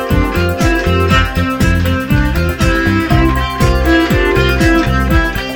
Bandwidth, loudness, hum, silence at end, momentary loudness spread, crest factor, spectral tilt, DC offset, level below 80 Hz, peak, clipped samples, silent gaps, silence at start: over 20 kHz; -12 LUFS; none; 0 s; 3 LU; 12 dB; -6 dB/octave; under 0.1%; -18 dBFS; 0 dBFS; under 0.1%; none; 0 s